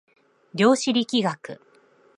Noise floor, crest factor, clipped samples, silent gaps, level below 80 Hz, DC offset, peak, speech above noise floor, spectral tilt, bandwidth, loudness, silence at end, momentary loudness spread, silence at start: -58 dBFS; 20 dB; under 0.1%; none; -74 dBFS; under 0.1%; -4 dBFS; 36 dB; -4.5 dB/octave; 11.5 kHz; -22 LUFS; 0.6 s; 20 LU; 0.55 s